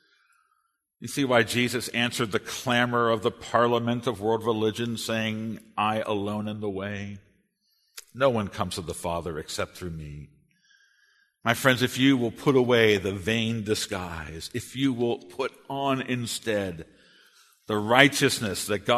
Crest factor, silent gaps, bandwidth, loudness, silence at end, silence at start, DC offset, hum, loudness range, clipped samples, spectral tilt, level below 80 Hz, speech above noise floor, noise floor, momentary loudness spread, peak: 26 dB; none; 13.5 kHz; -26 LUFS; 0 s; 1 s; under 0.1%; none; 7 LU; under 0.1%; -4.5 dB/octave; -56 dBFS; 47 dB; -73 dBFS; 13 LU; 0 dBFS